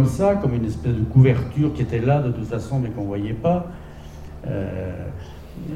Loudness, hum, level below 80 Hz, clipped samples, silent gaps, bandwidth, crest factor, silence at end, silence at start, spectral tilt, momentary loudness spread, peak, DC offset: -22 LUFS; none; -38 dBFS; under 0.1%; none; 9.6 kHz; 18 dB; 0 s; 0 s; -9 dB/octave; 20 LU; -4 dBFS; 0.1%